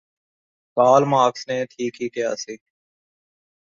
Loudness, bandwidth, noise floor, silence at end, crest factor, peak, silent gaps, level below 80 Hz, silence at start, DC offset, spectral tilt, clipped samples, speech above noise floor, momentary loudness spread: -20 LUFS; 7.4 kHz; under -90 dBFS; 1.15 s; 20 dB; -2 dBFS; none; -70 dBFS; 0.75 s; under 0.1%; -5 dB/octave; under 0.1%; over 70 dB; 15 LU